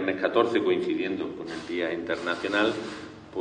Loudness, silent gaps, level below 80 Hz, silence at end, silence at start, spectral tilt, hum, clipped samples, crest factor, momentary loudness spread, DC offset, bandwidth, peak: -27 LUFS; none; -62 dBFS; 0 s; 0 s; -5 dB/octave; none; under 0.1%; 20 dB; 12 LU; under 0.1%; 9.8 kHz; -8 dBFS